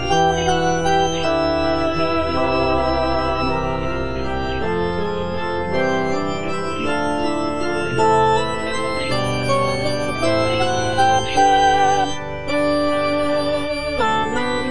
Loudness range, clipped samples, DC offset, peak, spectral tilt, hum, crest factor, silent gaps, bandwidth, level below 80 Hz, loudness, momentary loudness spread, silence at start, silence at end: 4 LU; under 0.1%; 4%; -4 dBFS; -5 dB/octave; none; 14 dB; none; 10.5 kHz; -36 dBFS; -19 LUFS; 7 LU; 0 s; 0 s